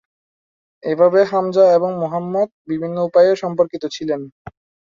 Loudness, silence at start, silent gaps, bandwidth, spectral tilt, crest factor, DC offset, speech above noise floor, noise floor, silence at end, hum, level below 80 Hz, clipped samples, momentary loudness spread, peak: -17 LUFS; 0.85 s; 2.52-2.65 s; 7.4 kHz; -6.5 dB/octave; 16 dB; under 0.1%; over 73 dB; under -90 dBFS; 0.6 s; none; -60 dBFS; under 0.1%; 12 LU; -2 dBFS